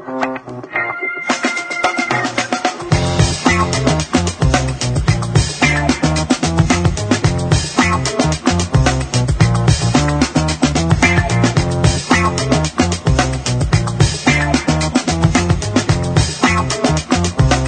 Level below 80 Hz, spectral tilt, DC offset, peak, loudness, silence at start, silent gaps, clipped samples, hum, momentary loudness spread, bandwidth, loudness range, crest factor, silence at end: -26 dBFS; -5 dB/octave; under 0.1%; 0 dBFS; -15 LUFS; 0 s; none; under 0.1%; none; 4 LU; 9.4 kHz; 2 LU; 14 dB; 0 s